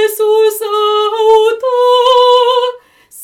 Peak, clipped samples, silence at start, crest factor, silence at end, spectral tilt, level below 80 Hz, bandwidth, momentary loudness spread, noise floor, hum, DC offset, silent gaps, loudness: 0 dBFS; under 0.1%; 0 s; 10 dB; 0 s; 0.5 dB/octave; -58 dBFS; 18 kHz; 6 LU; -36 dBFS; none; under 0.1%; none; -10 LUFS